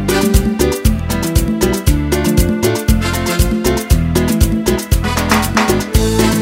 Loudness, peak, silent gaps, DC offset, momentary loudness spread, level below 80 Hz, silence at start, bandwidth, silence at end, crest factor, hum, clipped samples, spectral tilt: -14 LUFS; 0 dBFS; none; under 0.1%; 3 LU; -18 dBFS; 0 s; 16.5 kHz; 0 s; 14 dB; none; under 0.1%; -5 dB/octave